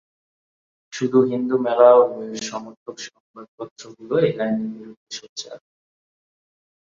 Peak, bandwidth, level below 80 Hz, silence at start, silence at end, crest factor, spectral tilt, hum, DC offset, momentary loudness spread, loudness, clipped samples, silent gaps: -2 dBFS; 7.6 kHz; -70 dBFS; 0.9 s; 1.35 s; 20 dB; -5.5 dB/octave; none; under 0.1%; 23 LU; -19 LUFS; under 0.1%; 2.77-2.86 s, 3.20-3.34 s, 3.48-3.58 s, 3.71-3.76 s, 4.97-5.07 s, 5.29-5.36 s